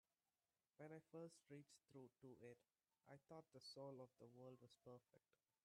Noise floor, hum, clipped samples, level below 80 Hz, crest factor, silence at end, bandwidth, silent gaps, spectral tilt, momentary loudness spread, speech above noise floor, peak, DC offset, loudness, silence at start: under -90 dBFS; none; under 0.1%; under -90 dBFS; 18 dB; 0.45 s; 11.5 kHz; none; -5.5 dB/octave; 8 LU; over 26 dB; -46 dBFS; under 0.1%; -64 LUFS; 0.8 s